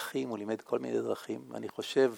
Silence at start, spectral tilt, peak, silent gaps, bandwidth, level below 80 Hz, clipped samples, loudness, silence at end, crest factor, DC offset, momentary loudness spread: 0 s; -5 dB/octave; -14 dBFS; none; 17.5 kHz; -84 dBFS; under 0.1%; -35 LUFS; 0 s; 18 dB; under 0.1%; 8 LU